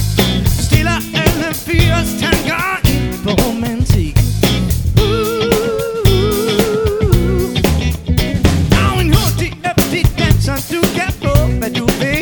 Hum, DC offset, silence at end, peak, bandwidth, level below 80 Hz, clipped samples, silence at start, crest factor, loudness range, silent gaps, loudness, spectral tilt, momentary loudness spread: none; under 0.1%; 0 s; 0 dBFS; over 20 kHz; -20 dBFS; 0.2%; 0 s; 14 dB; 1 LU; none; -14 LUFS; -5.5 dB/octave; 4 LU